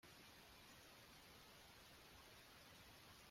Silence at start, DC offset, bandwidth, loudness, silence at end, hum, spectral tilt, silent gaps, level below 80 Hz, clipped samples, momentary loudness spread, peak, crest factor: 0 s; under 0.1%; 16 kHz; -63 LUFS; 0 s; none; -2.5 dB/octave; none; -78 dBFS; under 0.1%; 0 LU; -50 dBFS; 14 dB